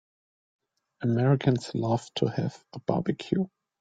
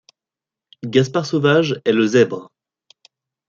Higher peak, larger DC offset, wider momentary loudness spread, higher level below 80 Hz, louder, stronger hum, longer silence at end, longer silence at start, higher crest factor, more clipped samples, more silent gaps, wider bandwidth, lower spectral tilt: second, -8 dBFS vs -2 dBFS; neither; first, 10 LU vs 7 LU; about the same, -64 dBFS vs -64 dBFS; second, -28 LUFS vs -17 LUFS; neither; second, 0.35 s vs 1.05 s; first, 1 s vs 0.85 s; about the same, 20 dB vs 18 dB; neither; neither; first, 9.2 kHz vs 7.6 kHz; first, -7.5 dB/octave vs -6 dB/octave